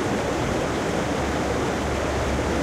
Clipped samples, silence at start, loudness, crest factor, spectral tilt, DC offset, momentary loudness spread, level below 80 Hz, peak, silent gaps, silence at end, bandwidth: under 0.1%; 0 s; -24 LUFS; 12 dB; -5 dB/octave; under 0.1%; 0 LU; -34 dBFS; -10 dBFS; none; 0 s; 15.5 kHz